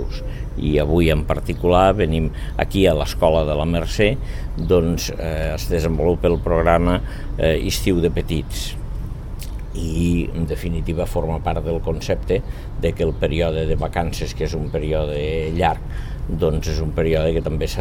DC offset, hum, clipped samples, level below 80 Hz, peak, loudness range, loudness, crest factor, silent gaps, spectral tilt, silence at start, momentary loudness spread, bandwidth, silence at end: under 0.1%; none; under 0.1%; -26 dBFS; -2 dBFS; 5 LU; -21 LUFS; 18 dB; none; -6.5 dB/octave; 0 s; 11 LU; 18 kHz; 0 s